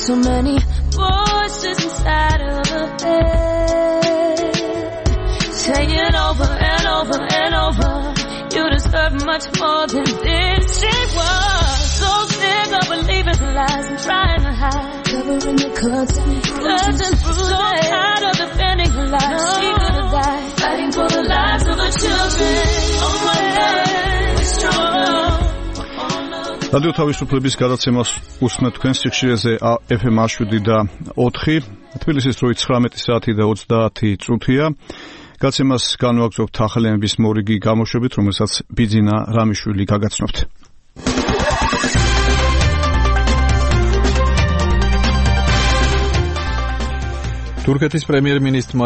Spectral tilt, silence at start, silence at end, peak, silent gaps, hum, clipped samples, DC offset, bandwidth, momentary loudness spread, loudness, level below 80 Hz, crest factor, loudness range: -4.5 dB/octave; 0 s; 0 s; -2 dBFS; none; none; under 0.1%; under 0.1%; 8.8 kHz; 5 LU; -17 LUFS; -22 dBFS; 14 dB; 2 LU